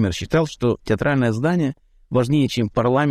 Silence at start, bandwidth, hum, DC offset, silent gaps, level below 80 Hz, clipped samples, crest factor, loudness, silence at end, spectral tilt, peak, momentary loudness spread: 0 s; 14 kHz; none; under 0.1%; none; -44 dBFS; under 0.1%; 12 dB; -20 LUFS; 0 s; -6.5 dB/octave; -8 dBFS; 4 LU